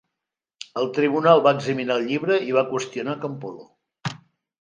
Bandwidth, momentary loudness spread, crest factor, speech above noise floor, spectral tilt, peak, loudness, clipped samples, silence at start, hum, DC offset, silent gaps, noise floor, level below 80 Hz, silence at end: 9.8 kHz; 17 LU; 22 dB; 64 dB; -5.5 dB/octave; -2 dBFS; -21 LUFS; under 0.1%; 0.6 s; none; under 0.1%; none; -85 dBFS; -72 dBFS; 0.55 s